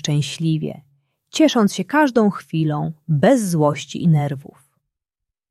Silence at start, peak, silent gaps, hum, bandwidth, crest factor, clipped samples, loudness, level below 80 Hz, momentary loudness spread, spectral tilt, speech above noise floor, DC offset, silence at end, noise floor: 0.05 s; -2 dBFS; none; none; 13 kHz; 16 dB; under 0.1%; -19 LUFS; -60 dBFS; 10 LU; -6 dB/octave; 66 dB; under 0.1%; 1.1 s; -84 dBFS